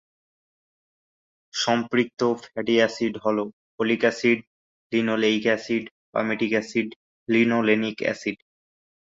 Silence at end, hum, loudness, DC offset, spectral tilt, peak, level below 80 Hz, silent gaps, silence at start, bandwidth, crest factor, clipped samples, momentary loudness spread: 0.8 s; none; -24 LUFS; under 0.1%; -4.5 dB/octave; -6 dBFS; -68 dBFS; 3.53-3.78 s, 4.47-4.90 s, 5.91-6.13 s, 6.96-7.26 s; 1.55 s; 7.8 kHz; 18 dB; under 0.1%; 9 LU